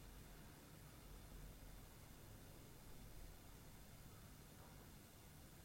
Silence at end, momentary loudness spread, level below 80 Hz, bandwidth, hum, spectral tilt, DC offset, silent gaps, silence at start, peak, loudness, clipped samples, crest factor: 0 s; 2 LU; -64 dBFS; 16 kHz; none; -4.5 dB/octave; under 0.1%; none; 0 s; -44 dBFS; -61 LUFS; under 0.1%; 14 dB